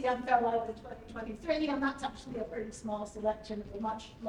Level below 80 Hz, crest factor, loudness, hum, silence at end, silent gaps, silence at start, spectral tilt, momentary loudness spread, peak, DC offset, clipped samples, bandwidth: -56 dBFS; 22 dB; -35 LUFS; none; 0 s; none; 0 s; -5 dB/octave; 13 LU; -14 dBFS; under 0.1%; under 0.1%; 11 kHz